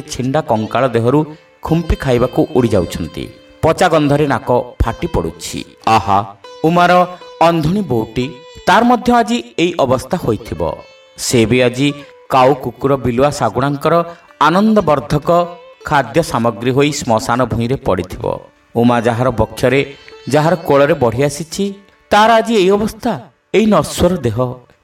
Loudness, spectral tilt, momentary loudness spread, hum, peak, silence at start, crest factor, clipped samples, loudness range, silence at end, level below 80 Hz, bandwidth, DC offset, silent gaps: -14 LUFS; -5.5 dB/octave; 11 LU; none; 0 dBFS; 0 s; 14 dB; under 0.1%; 2 LU; 0.25 s; -34 dBFS; 16.5 kHz; under 0.1%; none